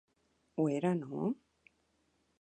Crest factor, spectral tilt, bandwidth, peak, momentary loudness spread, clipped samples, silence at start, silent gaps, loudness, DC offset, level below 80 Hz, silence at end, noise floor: 18 dB; -8.5 dB/octave; 9.6 kHz; -20 dBFS; 12 LU; under 0.1%; 0.55 s; none; -36 LUFS; under 0.1%; -80 dBFS; 1.05 s; -76 dBFS